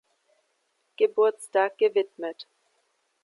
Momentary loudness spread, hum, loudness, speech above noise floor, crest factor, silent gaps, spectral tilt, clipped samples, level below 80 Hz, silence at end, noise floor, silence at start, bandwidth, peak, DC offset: 16 LU; none; -25 LUFS; 49 dB; 18 dB; none; -3 dB/octave; under 0.1%; -88 dBFS; 0.8 s; -73 dBFS; 1 s; 11.5 kHz; -10 dBFS; under 0.1%